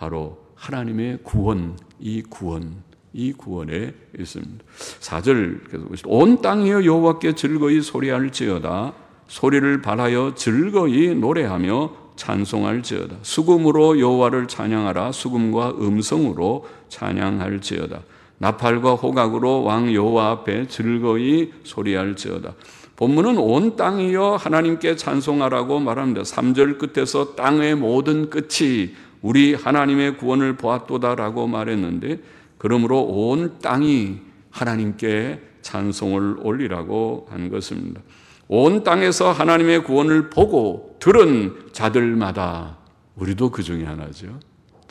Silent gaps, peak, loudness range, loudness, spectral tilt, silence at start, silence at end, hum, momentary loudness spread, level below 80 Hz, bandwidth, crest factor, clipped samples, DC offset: none; -2 dBFS; 7 LU; -19 LUFS; -6 dB/octave; 0 s; 0.5 s; none; 15 LU; -48 dBFS; 12 kHz; 18 dB; under 0.1%; under 0.1%